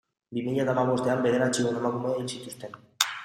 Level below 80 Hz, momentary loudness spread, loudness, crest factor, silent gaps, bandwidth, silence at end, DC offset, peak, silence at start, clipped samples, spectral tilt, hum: -68 dBFS; 14 LU; -27 LUFS; 26 dB; none; 15.5 kHz; 0 s; under 0.1%; -2 dBFS; 0.3 s; under 0.1%; -4.5 dB/octave; none